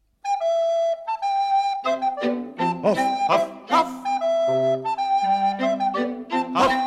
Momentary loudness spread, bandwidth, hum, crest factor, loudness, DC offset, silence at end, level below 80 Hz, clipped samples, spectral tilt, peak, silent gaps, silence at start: 5 LU; 13 kHz; none; 16 dB; -22 LUFS; under 0.1%; 0 s; -60 dBFS; under 0.1%; -5 dB/octave; -6 dBFS; none; 0.25 s